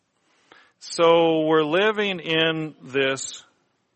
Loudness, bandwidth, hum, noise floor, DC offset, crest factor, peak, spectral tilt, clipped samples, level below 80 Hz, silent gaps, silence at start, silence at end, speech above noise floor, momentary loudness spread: -21 LUFS; 8.8 kHz; none; -65 dBFS; under 0.1%; 18 dB; -6 dBFS; -4 dB/octave; under 0.1%; -72 dBFS; none; 0.85 s; 0.55 s; 44 dB; 13 LU